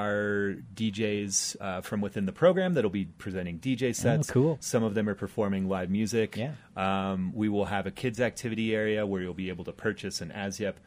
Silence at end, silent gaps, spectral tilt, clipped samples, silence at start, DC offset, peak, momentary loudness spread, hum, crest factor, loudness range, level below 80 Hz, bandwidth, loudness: 0.1 s; none; -5 dB/octave; under 0.1%; 0 s; under 0.1%; -12 dBFS; 9 LU; none; 18 dB; 3 LU; -60 dBFS; 15.5 kHz; -30 LUFS